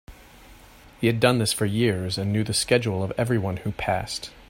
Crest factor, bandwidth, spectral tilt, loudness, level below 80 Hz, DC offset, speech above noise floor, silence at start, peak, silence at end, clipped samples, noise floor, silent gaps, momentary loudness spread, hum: 22 dB; 16.5 kHz; -5 dB/octave; -24 LUFS; -50 dBFS; under 0.1%; 25 dB; 0.1 s; -4 dBFS; 0.05 s; under 0.1%; -49 dBFS; none; 7 LU; none